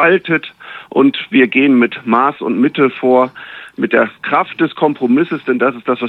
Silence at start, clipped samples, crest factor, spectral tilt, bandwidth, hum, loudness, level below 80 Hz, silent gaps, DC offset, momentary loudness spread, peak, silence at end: 0 s; under 0.1%; 14 dB; -8 dB/octave; 4.4 kHz; none; -14 LUFS; -66 dBFS; none; under 0.1%; 8 LU; 0 dBFS; 0 s